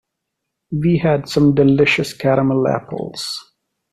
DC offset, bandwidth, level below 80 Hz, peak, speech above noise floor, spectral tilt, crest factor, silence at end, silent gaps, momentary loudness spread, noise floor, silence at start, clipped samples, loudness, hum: under 0.1%; 13.5 kHz; -46 dBFS; -2 dBFS; 62 dB; -6.5 dB/octave; 14 dB; 0.5 s; none; 13 LU; -78 dBFS; 0.7 s; under 0.1%; -16 LUFS; none